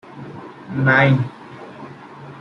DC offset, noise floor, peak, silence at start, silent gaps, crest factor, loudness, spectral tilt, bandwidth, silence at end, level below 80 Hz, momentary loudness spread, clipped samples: under 0.1%; -38 dBFS; -2 dBFS; 0.15 s; none; 18 dB; -17 LUFS; -8 dB/octave; 6.2 kHz; 0 s; -58 dBFS; 24 LU; under 0.1%